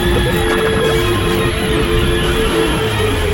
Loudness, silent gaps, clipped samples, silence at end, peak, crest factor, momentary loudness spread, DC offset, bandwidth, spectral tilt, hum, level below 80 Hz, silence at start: -15 LUFS; none; under 0.1%; 0 s; -2 dBFS; 12 dB; 2 LU; under 0.1%; 17 kHz; -5 dB/octave; none; -22 dBFS; 0 s